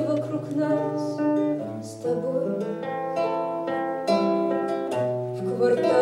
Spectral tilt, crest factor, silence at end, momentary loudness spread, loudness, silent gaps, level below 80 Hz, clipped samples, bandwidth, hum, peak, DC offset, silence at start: -7 dB/octave; 16 dB; 0 s; 6 LU; -26 LUFS; none; -70 dBFS; under 0.1%; 12.5 kHz; none; -10 dBFS; under 0.1%; 0 s